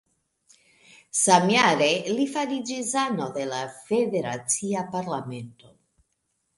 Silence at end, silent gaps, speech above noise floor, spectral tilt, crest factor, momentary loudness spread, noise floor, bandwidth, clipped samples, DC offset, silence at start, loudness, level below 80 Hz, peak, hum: 1.05 s; none; 51 dB; -3 dB/octave; 20 dB; 13 LU; -75 dBFS; 11.5 kHz; under 0.1%; under 0.1%; 1.15 s; -24 LUFS; -70 dBFS; -6 dBFS; none